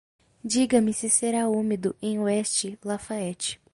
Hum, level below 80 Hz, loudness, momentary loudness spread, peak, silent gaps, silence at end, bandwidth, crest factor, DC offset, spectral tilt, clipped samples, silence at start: none; -62 dBFS; -25 LUFS; 10 LU; -8 dBFS; none; 0.2 s; 11.5 kHz; 18 dB; under 0.1%; -3.5 dB/octave; under 0.1%; 0.45 s